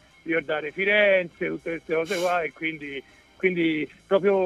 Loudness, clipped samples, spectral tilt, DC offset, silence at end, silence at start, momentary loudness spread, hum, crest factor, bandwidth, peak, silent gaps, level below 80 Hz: -25 LUFS; under 0.1%; -5 dB/octave; under 0.1%; 0 s; 0.25 s; 11 LU; none; 16 dB; 14 kHz; -8 dBFS; none; -64 dBFS